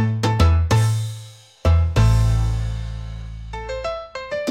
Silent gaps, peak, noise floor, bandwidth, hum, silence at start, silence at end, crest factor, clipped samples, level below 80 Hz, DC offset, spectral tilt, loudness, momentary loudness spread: none; -4 dBFS; -40 dBFS; 14.5 kHz; none; 0 s; 0 s; 16 dB; under 0.1%; -26 dBFS; under 0.1%; -6.5 dB/octave; -20 LUFS; 16 LU